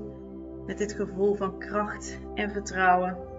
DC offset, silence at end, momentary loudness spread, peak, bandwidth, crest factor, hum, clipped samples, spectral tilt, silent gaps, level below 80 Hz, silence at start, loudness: under 0.1%; 0 s; 17 LU; -10 dBFS; 8 kHz; 20 dB; none; under 0.1%; -5 dB/octave; none; -48 dBFS; 0 s; -28 LUFS